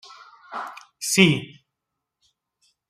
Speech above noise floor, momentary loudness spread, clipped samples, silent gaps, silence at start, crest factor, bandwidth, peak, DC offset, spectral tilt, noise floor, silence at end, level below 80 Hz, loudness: 61 dB; 21 LU; under 0.1%; none; 0.1 s; 24 dB; 15.5 kHz; -2 dBFS; under 0.1%; -4 dB/octave; -83 dBFS; 1.45 s; -64 dBFS; -20 LUFS